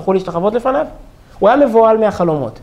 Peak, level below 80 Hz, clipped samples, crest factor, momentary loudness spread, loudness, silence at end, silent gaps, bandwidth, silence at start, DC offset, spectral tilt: 0 dBFS; -42 dBFS; under 0.1%; 12 dB; 7 LU; -13 LUFS; 0 s; none; 11.5 kHz; 0 s; under 0.1%; -7.5 dB/octave